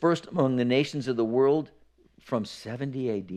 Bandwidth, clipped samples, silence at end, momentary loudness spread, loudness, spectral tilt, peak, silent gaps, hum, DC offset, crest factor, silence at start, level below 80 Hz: 11.5 kHz; under 0.1%; 0 s; 10 LU; -27 LUFS; -7 dB/octave; -10 dBFS; none; none; under 0.1%; 16 dB; 0 s; -66 dBFS